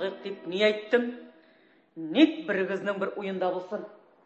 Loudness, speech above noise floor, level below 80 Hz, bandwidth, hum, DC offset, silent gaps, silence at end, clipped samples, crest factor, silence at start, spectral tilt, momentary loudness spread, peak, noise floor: -28 LUFS; 33 dB; -80 dBFS; 8 kHz; none; under 0.1%; none; 0.3 s; under 0.1%; 22 dB; 0 s; -6 dB/octave; 15 LU; -8 dBFS; -61 dBFS